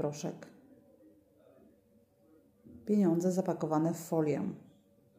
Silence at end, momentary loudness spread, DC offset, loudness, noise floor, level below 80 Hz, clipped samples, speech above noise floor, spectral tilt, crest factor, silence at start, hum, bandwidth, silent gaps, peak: 0.6 s; 20 LU; under 0.1%; -32 LUFS; -67 dBFS; -78 dBFS; under 0.1%; 35 dB; -7.5 dB/octave; 18 dB; 0 s; none; 15.5 kHz; none; -18 dBFS